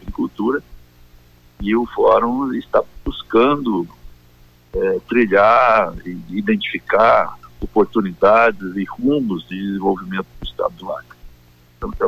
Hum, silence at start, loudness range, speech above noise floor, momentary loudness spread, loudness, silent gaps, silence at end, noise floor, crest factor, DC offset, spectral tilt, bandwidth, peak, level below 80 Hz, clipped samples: 60 Hz at -45 dBFS; 0 s; 4 LU; 32 dB; 16 LU; -17 LUFS; none; 0 s; -49 dBFS; 14 dB; under 0.1%; -7.5 dB/octave; 15.5 kHz; -4 dBFS; -40 dBFS; under 0.1%